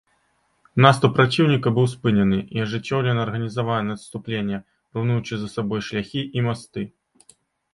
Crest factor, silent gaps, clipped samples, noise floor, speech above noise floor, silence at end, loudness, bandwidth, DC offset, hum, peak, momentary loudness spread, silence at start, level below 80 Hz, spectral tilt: 22 dB; none; under 0.1%; -66 dBFS; 45 dB; 0.85 s; -22 LUFS; 11.5 kHz; under 0.1%; none; 0 dBFS; 13 LU; 0.75 s; -54 dBFS; -7 dB/octave